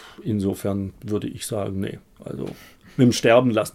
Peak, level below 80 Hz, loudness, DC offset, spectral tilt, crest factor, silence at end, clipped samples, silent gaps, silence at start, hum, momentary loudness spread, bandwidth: -2 dBFS; -56 dBFS; -22 LUFS; under 0.1%; -6 dB/octave; 20 dB; 0.05 s; under 0.1%; none; 0 s; none; 17 LU; 16 kHz